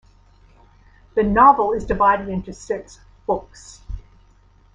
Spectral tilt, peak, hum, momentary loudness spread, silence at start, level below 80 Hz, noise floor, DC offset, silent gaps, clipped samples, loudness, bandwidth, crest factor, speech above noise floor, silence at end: -6.5 dB/octave; 0 dBFS; none; 24 LU; 1.15 s; -40 dBFS; -53 dBFS; under 0.1%; none; under 0.1%; -19 LUFS; 9.8 kHz; 20 dB; 34 dB; 0.75 s